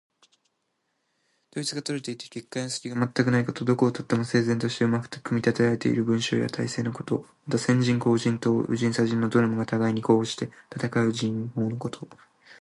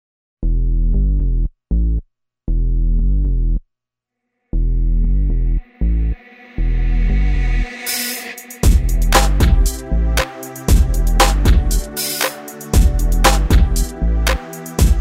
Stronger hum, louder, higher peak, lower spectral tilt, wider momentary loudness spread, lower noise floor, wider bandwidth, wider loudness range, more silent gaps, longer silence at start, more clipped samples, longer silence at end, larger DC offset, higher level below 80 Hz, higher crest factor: neither; second, -26 LUFS vs -18 LUFS; second, -6 dBFS vs 0 dBFS; first, -6 dB/octave vs -4.5 dB/octave; about the same, 10 LU vs 10 LU; second, -76 dBFS vs -81 dBFS; second, 11.5 kHz vs 16.5 kHz; about the same, 4 LU vs 6 LU; neither; first, 1.55 s vs 0.4 s; neither; about the same, 0.1 s vs 0 s; neither; second, -64 dBFS vs -16 dBFS; about the same, 20 dB vs 16 dB